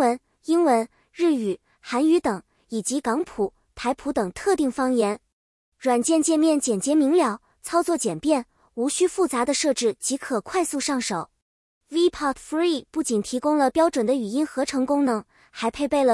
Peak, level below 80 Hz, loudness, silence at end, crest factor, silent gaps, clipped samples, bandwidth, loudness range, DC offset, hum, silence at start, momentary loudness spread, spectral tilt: -8 dBFS; -58 dBFS; -23 LUFS; 0 s; 16 dB; 5.33-5.72 s, 11.42-11.81 s; under 0.1%; 12 kHz; 3 LU; under 0.1%; none; 0 s; 9 LU; -3.5 dB/octave